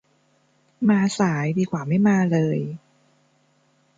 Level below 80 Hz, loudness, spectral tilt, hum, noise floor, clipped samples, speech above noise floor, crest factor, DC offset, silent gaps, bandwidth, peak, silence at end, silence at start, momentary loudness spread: -64 dBFS; -21 LUFS; -7 dB/octave; none; -63 dBFS; under 0.1%; 43 dB; 16 dB; under 0.1%; none; 9 kHz; -6 dBFS; 1.2 s; 0.8 s; 9 LU